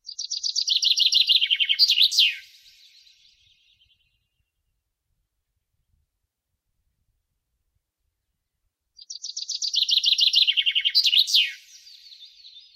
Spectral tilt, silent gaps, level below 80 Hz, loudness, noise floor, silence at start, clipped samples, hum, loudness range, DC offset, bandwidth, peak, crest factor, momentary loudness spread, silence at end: 8.5 dB/octave; none; -78 dBFS; -18 LUFS; -80 dBFS; 0.05 s; under 0.1%; none; 11 LU; under 0.1%; 16 kHz; -6 dBFS; 20 dB; 14 LU; 0.15 s